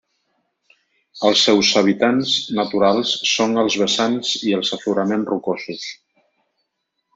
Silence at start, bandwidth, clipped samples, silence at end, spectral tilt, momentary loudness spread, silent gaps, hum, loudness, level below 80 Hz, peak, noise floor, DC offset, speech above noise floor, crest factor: 1.15 s; 8 kHz; under 0.1%; 1.2 s; -3.5 dB/octave; 10 LU; none; none; -18 LUFS; -62 dBFS; -2 dBFS; -75 dBFS; under 0.1%; 57 dB; 18 dB